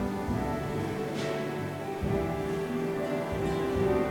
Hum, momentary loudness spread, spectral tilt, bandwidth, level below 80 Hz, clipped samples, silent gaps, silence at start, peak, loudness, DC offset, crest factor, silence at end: none; 5 LU; -7 dB/octave; 18 kHz; -46 dBFS; under 0.1%; none; 0 s; -16 dBFS; -31 LUFS; under 0.1%; 14 dB; 0 s